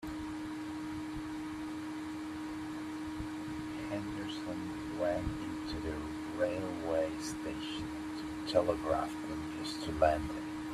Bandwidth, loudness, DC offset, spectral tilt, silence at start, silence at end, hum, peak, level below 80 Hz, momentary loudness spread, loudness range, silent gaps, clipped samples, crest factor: 14 kHz; -37 LUFS; under 0.1%; -5.5 dB/octave; 0 s; 0 s; none; -14 dBFS; -54 dBFS; 9 LU; 6 LU; none; under 0.1%; 22 dB